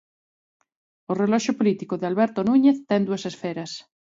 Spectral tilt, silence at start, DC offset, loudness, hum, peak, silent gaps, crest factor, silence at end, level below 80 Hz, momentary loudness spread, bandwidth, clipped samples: -6 dB/octave; 1.1 s; under 0.1%; -23 LUFS; none; -8 dBFS; none; 16 dB; 0.3 s; -68 dBFS; 13 LU; 7.8 kHz; under 0.1%